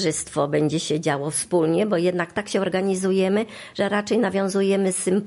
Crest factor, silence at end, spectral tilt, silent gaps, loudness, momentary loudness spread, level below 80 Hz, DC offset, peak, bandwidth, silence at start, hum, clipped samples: 14 dB; 0 s; -5 dB/octave; none; -22 LUFS; 4 LU; -60 dBFS; under 0.1%; -8 dBFS; 11.5 kHz; 0 s; none; under 0.1%